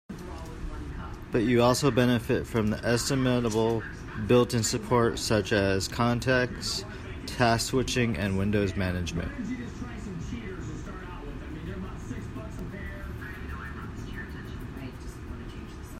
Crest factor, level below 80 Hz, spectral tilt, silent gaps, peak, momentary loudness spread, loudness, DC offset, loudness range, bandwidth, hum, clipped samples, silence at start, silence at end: 20 dB; -42 dBFS; -5 dB/octave; none; -10 dBFS; 16 LU; -28 LUFS; under 0.1%; 13 LU; 16 kHz; none; under 0.1%; 0.1 s; 0 s